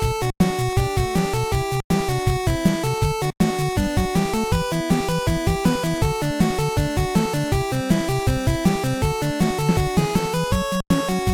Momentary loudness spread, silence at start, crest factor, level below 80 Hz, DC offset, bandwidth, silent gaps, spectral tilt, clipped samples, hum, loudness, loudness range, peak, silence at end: 2 LU; 0 s; 16 dB; -32 dBFS; under 0.1%; 17.5 kHz; 1.84-1.90 s; -5.5 dB/octave; under 0.1%; none; -21 LUFS; 0 LU; -4 dBFS; 0 s